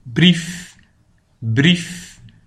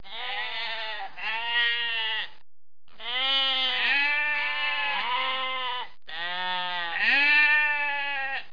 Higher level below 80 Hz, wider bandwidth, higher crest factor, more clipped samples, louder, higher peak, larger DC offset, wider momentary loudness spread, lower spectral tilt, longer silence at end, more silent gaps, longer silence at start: first, -50 dBFS vs -70 dBFS; first, 12.5 kHz vs 5.2 kHz; about the same, 18 dB vs 16 dB; neither; first, -16 LUFS vs -24 LUFS; first, 0 dBFS vs -12 dBFS; second, under 0.1% vs 1%; first, 18 LU vs 13 LU; first, -5 dB/octave vs -1.5 dB/octave; first, 0.2 s vs 0.05 s; neither; about the same, 0.05 s vs 0.05 s